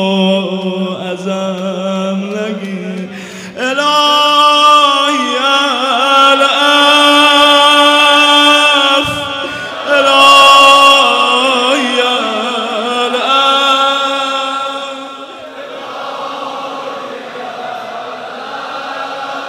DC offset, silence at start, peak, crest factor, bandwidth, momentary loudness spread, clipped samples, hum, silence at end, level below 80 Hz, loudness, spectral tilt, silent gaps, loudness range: under 0.1%; 0 s; 0 dBFS; 12 dB; 16 kHz; 18 LU; 0.5%; none; 0 s; -56 dBFS; -8 LUFS; -2.5 dB/octave; none; 16 LU